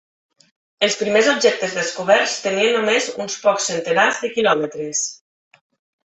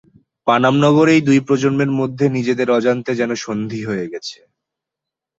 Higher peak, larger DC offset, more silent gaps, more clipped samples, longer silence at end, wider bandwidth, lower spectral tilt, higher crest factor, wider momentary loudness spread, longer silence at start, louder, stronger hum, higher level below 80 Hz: about the same, -2 dBFS vs -2 dBFS; neither; neither; neither; about the same, 0.95 s vs 1.05 s; about the same, 8.4 kHz vs 8 kHz; second, -2 dB/octave vs -6.5 dB/octave; about the same, 18 dB vs 16 dB; second, 7 LU vs 11 LU; first, 0.8 s vs 0.45 s; about the same, -18 LUFS vs -16 LUFS; neither; second, -66 dBFS vs -58 dBFS